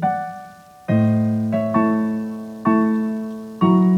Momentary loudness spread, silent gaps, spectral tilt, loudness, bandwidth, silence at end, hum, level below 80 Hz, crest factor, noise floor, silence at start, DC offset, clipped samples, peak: 13 LU; none; -9.5 dB/octave; -20 LUFS; 7 kHz; 0 s; none; -64 dBFS; 16 dB; -41 dBFS; 0 s; under 0.1%; under 0.1%; -4 dBFS